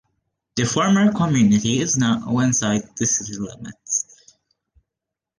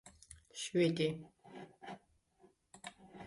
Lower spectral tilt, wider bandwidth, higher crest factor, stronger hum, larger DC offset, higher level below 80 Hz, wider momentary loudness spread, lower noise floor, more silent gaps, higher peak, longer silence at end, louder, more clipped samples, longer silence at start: about the same, -4.5 dB/octave vs -5 dB/octave; about the same, 10.5 kHz vs 11.5 kHz; about the same, 16 dB vs 20 dB; neither; neither; first, -54 dBFS vs -72 dBFS; second, 14 LU vs 22 LU; first, -85 dBFS vs -70 dBFS; neither; first, -6 dBFS vs -22 dBFS; first, 1.35 s vs 0 s; first, -19 LUFS vs -36 LUFS; neither; first, 0.55 s vs 0.05 s